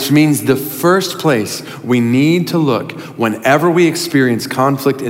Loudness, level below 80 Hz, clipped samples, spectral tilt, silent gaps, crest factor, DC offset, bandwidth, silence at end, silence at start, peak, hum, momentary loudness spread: -14 LUFS; -60 dBFS; under 0.1%; -5.5 dB/octave; none; 12 dB; under 0.1%; 16.5 kHz; 0 s; 0 s; 0 dBFS; none; 7 LU